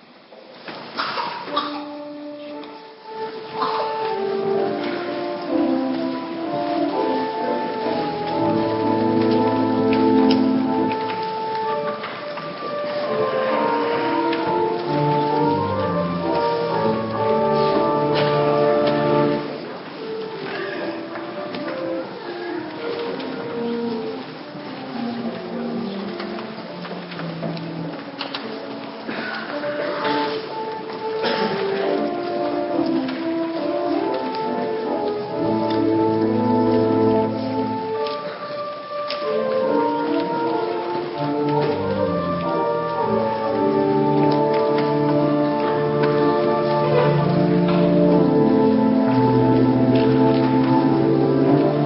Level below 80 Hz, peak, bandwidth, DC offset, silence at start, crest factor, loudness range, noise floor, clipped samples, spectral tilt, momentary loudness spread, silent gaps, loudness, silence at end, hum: -56 dBFS; -4 dBFS; 5.8 kHz; under 0.1%; 0.3 s; 16 dB; 11 LU; -44 dBFS; under 0.1%; -11.5 dB/octave; 13 LU; none; -21 LUFS; 0 s; none